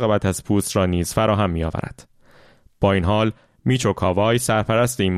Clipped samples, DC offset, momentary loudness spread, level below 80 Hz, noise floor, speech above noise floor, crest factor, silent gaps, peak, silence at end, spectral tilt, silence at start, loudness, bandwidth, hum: under 0.1%; under 0.1%; 7 LU; -40 dBFS; -51 dBFS; 32 dB; 16 dB; none; -4 dBFS; 0 s; -5.5 dB/octave; 0 s; -20 LUFS; 15 kHz; none